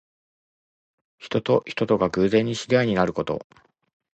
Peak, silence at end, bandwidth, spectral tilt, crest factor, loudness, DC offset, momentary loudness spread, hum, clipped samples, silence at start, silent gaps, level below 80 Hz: -6 dBFS; 0.75 s; 8.8 kHz; -6 dB/octave; 20 dB; -23 LUFS; under 0.1%; 8 LU; none; under 0.1%; 1.2 s; none; -54 dBFS